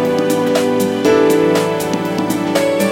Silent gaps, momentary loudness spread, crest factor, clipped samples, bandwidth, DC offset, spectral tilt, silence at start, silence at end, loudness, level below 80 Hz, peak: none; 6 LU; 14 dB; under 0.1%; 17 kHz; under 0.1%; -5 dB/octave; 0 s; 0 s; -15 LUFS; -52 dBFS; 0 dBFS